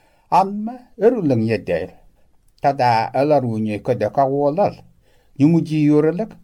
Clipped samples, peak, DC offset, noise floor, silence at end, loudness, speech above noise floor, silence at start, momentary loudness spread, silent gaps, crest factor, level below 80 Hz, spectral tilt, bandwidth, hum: under 0.1%; -4 dBFS; under 0.1%; -54 dBFS; 0.1 s; -18 LUFS; 36 dB; 0.3 s; 7 LU; none; 16 dB; -54 dBFS; -8.5 dB/octave; 11.5 kHz; none